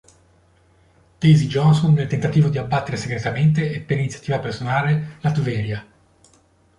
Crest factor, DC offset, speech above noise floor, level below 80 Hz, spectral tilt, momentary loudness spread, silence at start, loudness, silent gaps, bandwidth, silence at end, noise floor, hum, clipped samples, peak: 16 dB; under 0.1%; 38 dB; -50 dBFS; -7.5 dB/octave; 9 LU; 1.2 s; -20 LUFS; none; 10.5 kHz; 0.95 s; -57 dBFS; none; under 0.1%; -4 dBFS